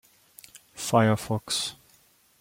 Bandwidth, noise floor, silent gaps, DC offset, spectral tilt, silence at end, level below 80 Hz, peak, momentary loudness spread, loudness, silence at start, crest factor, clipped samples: 16.5 kHz; -61 dBFS; none; under 0.1%; -4.5 dB/octave; 0.65 s; -62 dBFS; -6 dBFS; 25 LU; -26 LUFS; 0.55 s; 22 dB; under 0.1%